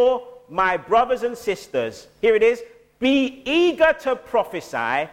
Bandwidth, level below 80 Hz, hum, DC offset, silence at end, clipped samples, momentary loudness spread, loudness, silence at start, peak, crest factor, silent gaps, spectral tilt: 16 kHz; -52 dBFS; none; under 0.1%; 0 s; under 0.1%; 10 LU; -21 LUFS; 0 s; -6 dBFS; 14 dB; none; -4.5 dB/octave